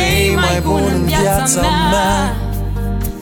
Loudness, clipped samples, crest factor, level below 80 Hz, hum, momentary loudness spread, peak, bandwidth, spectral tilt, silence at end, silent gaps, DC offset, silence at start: -15 LUFS; under 0.1%; 12 dB; -22 dBFS; none; 8 LU; -2 dBFS; over 20 kHz; -4.5 dB/octave; 0 s; none; under 0.1%; 0 s